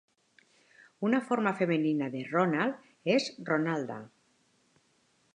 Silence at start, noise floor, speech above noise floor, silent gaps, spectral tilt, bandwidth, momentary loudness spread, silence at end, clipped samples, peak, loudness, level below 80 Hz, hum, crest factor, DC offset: 1 s; -70 dBFS; 41 dB; none; -6 dB/octave; 10.5 kHz; 7 LU; 1.3 s; under 0.1%; -12 dBFS; -30 LUFS; -84 dBFS; none; 20 dB; under 0.1%